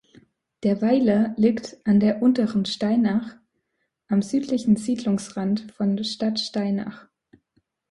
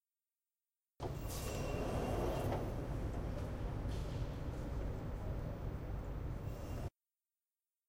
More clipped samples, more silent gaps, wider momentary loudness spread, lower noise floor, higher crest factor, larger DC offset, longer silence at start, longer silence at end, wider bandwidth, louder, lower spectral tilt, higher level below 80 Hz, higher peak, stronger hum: neither; neither; about the same, 7 LU vs 7 LU; second, -76 dBFS vs under -90 dBFS; about the same, 16 dB vs 16 dB; neither; second, 0.6 s vs 1 s; about the same, 0.9 s vs 1 s; second, 11.5 kHz vs 16 kHz; first, -23 LUFS vs -43 LUFS; about the same, -6.5 dB/octave vs -6.5 dB/octave; second, -62 dBFS vs -46 dBFS; first, -8 dBFS vs -26 dBFS; neither